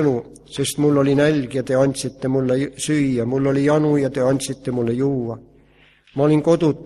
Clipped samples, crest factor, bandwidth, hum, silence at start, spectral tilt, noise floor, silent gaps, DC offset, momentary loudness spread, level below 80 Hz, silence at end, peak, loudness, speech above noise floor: under 0.1%; 16 dB; 13 kHz; none; 0 s; -6 dB/octave; -53 dBFS; none; under 0.1%; 9 LU; -52 dBFS; 0 s; -4 dBFS; -19 LUFS; 35 dB